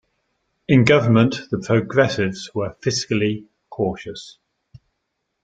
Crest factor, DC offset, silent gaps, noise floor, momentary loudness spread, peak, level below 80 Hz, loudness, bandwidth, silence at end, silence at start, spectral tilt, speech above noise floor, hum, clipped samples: 20 dB; under 0.1%; none; -76 dBFS; 18 LU; 0 dBFS; -54 dBFS; -19 LUFS; 9 kHz; 1.15 s; 0.7 s; -6 dB/octave; 57 dB; none; under 0.1%